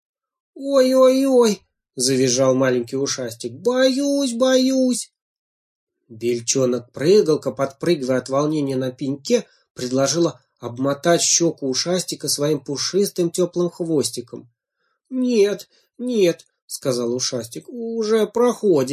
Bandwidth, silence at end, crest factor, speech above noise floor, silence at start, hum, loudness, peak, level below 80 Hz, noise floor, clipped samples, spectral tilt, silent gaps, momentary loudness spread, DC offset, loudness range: 15.5 kHz; 0 s; 16 dB; 54 dB; 0.55 s; none; -19 LUFS; -4 dBFS; -66 dBFS; -73 dBFS; under 0.1%; -4 dB/octave; 5.22-5.87 s, 9.70-9.75 s, 16.62-16.68 s; 13 LU; under 0.1%; 4 LU